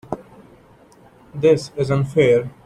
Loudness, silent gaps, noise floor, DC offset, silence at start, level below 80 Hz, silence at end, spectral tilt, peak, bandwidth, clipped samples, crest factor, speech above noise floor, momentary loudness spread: -18 LUFS; none; -49 dBFS; under 0.1%; 0.1 s; -52 dBFS; 0.15 s; -7 dB/octave; -4 dBFS; 11.5 kHz; under 0.1%; 16 dB; 32 dB; 17 LU